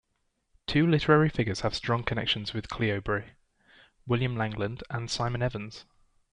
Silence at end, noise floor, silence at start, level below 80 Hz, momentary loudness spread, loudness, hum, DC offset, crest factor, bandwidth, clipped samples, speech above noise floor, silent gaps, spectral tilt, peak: 0.5 s; -76 dBFS; 0.7 s; -50 dBFS; 12 LU; -28 LUFS; none; under 0.1%; 20 dB; 10.5 kHz; under 0.1%; 48 dB; none; -6 dB/octave; -10 dBFS